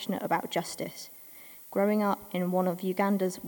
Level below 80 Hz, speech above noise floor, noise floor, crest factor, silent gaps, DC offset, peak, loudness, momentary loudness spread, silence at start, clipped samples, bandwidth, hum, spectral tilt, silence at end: -72 dBFS; 20 dB; -49 dBFS; 18 dB; none; under 0.1%; -14 dBFS; -30 LUFS; 17 LU; 0 s; under 0.1%; 19 kHz; none; -6 dB/octave; 0 s